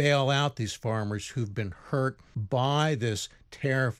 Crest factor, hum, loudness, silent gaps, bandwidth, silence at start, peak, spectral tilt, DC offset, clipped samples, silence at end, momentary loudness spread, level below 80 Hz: 18 dB; none; -29 LUFS; none; 13.5 kHz; 0 s; -10 dBFS; -5.5 dB/octave; under 0.1%; under 0.1%; 0.05 s; 9 LU; -60 dBFS